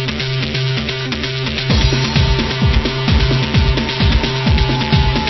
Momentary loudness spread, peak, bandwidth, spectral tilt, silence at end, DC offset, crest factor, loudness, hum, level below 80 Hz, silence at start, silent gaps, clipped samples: 5 LU; 0 dBFS; 6.2 kHz; -5.5 dB/octave; 0 s; under 0.1%; 14 dB; -15 LUFS; none; -20 dBFS; 0 s; none; under 0.1%